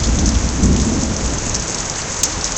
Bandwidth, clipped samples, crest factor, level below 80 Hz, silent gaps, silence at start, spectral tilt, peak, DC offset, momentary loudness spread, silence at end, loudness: 15.5 kHz; under 0.1%; 16 dB; -22 dBFS; none; 0 s; -3.5 dB/octave; 0 dBFS; under 0.1%; 5 LU; 0 s; -17 LUFS